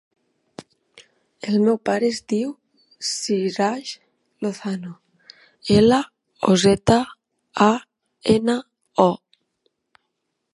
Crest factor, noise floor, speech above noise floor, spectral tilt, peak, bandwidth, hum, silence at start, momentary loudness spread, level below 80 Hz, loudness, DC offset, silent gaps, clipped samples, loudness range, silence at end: 22 dB; -76 dBFS; 58 dB; -5 dB/octave; 0 dBFS; 11.5 kHz; none; 0.6 s; 17 LU; -52 dBFS; -21 LUFS; under 0.1%; none; under 0.1%; 6 LU; 1.35 s